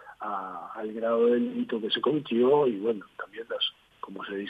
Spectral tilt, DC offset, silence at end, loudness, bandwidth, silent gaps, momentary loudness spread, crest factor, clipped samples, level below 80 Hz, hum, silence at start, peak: -7 dB/octave; under 0.1%; 0 s; -28 LUFS; 5 kHz; none; 16 LU; 16 dB; under 0.1%; -76 dBFS; none; 0 s; -12 dBFS